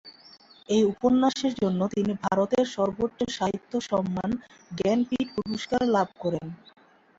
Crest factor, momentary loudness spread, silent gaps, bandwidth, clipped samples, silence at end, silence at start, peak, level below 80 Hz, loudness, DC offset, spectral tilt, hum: 16 dB; 9 LU; none; 7.8 kHz; under 0.1%; 0.65 s; 0.05 s; -10 dBFS; -58 dBFS; -26 LUFS; under 0.1%; -6 dB/octave; none